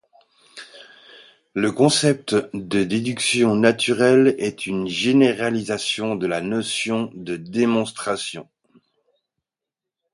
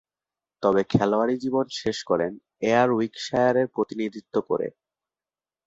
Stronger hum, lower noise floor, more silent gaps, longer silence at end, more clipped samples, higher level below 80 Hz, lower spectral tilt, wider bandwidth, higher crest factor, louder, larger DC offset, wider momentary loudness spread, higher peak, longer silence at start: neither; about the same, -87 dBFS vs under -90 dBFS; neither; first, 1.7 s vs 0.95 s; neither; about the same, -60 dBFS vs -58 dBFS; second, -4.5 dB/octave vs -6 dB/octave; first, 11.5 kHz vs 8 kHz; about the same, 22 dB vs 18 dB; first, -20 LUFS vs -25 LUFS; neither; first, 13 LU vs 8 LU; first, 0 dBFS vs -6 dBFS; about the same, 0.55 s vs 0.6 s